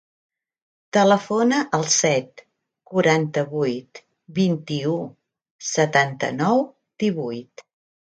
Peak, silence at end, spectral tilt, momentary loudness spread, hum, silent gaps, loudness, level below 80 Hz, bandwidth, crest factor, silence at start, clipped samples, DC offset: -4 dBFS; 0.7 s; -4.5 dB/octave; 13 LU; none; 5.51-5.59 s; -21 LUFS; -68 dBFS; 9.4 kHz; 18 dB; 0.95 s; under 0.1%; under 0.1%